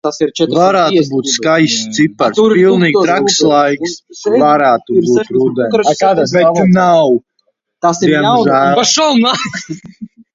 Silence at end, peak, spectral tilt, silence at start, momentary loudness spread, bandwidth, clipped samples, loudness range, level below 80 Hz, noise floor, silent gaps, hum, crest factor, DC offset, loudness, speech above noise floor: 0.3 s; 0 dBFS; -4.5 dB/octave; 0.05 s; 7 LU; 7.8 kHz; under 0.1%; 1 LU; -54 dBFS; -63 dBFS; none; none; 12 dB; under 0.1%; -11 LUFS; 52 dB